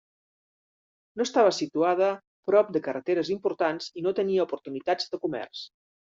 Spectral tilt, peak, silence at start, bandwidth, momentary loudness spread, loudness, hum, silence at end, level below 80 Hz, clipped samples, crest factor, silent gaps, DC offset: -3.5 dB/octave; -10 dBFS; 1.15 s; 7.8 kHz; 12 LU; -27 LUFS; none; 0.35 s; -74 dBFS; under 0.1%; 18 dB; 2.27-2.43 s; under 0.1%